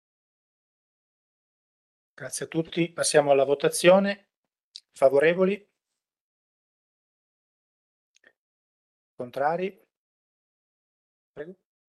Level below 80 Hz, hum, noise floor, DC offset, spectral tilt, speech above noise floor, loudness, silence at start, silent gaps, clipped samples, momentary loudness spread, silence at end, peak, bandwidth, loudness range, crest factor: -76 dBFS; none; -87 dBFS; under 0.1%; -4 dB/octave; 64 dB; -24 LUFS; 2.2 s; 4.36-4.43 s, 4.63-4.72 s, 6.20-8.15 s, 8.37-9.18 s, 9.97-11.34 s; under 0.1%; 22 LU; 0.35 s; -6 dBFS; 12.5 kHz; 13 LU; 22 dB